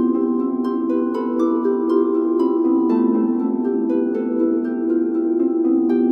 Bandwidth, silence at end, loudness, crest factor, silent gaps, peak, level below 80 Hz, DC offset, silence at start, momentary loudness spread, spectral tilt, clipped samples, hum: 5.2 kHz; 0 s; -19 LUFS; 12 dB; none; -6 dBFS; -76 dBFS; under 0.1%; 0 s; 3 LU; -9 dB/octave; under 0.1%; none